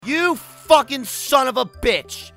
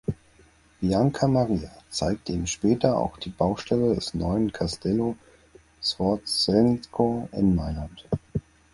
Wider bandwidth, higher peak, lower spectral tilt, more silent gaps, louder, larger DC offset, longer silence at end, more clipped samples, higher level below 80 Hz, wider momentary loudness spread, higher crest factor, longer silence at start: first, 16 kHz vs 11.5 kHz; first, 0 dBFS vs -4 dBFS; second, -2.5 dB/octave vs -6 dB/octave; neither; first, -19 LUFS vs -25 LUFS; neither; second, 0.1 s vs 0.35 s; neither; about the same, -42 dBFS vs -44 dBFS; about the same, 9 LU vs 11 LU; about the same, 20 dB vs 20 dB; about the same, 0.05 s vs 0.1 s